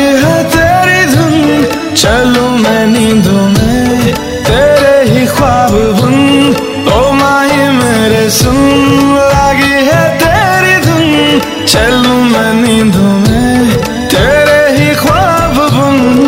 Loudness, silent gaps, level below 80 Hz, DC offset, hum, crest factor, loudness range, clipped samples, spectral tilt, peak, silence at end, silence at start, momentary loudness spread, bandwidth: -7 LUFS; none; -26 dBFS; under 0.1%; none; 8 dB; 1 LU; 0.5%; -5 dB/octave; 0 dBFS; 0 s; 0 s; 3 LU; 16.5 kHz